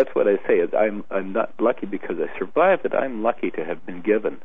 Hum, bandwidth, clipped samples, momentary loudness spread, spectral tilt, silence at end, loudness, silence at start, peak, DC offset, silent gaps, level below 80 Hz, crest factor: none; 3.8 kHz; under 0.1%; 9 LU; -9 dB/octave; 0.05 s; -23 LUFS; 0 s; -6 dBFS; 2%; none; -60 dBFS; 16 dB